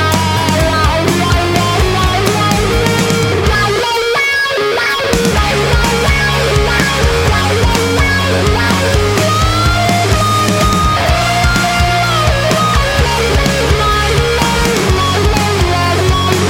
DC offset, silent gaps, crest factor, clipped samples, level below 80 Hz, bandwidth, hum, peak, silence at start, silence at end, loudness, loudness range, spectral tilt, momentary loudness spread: under 0.1%; none; 12 dB; under 0.1%; -20 dBFS; 17 kHz; none; 0 dBFS; 0 s; 0 s; -11 LUFS; 1 LU; -4.5 dB/octave; 1 LU